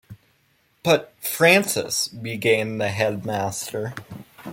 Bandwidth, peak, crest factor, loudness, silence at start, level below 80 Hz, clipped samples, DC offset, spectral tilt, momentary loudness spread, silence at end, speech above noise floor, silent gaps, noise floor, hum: 17 kHz; -2 dBFS; 22 dB; -22 LUFS; 0.1 s; -62 dBFS; under 0.1%; under 0.1%; -3.5 dB/octave; 16 LU; 0 s; 42 dB; none; -64 dBFS; none